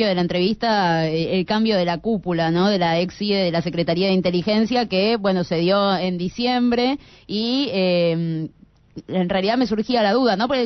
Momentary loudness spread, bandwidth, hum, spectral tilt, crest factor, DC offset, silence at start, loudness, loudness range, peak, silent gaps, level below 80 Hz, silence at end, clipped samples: 5 LU; 6.2 kHz; none; -6.5 dB/octave; 12 dB; under 0.1%; 0 s; -20 LUFS; 2 LU; -8 dBFS; none; -52 dBFS; 0 s; under 0.1%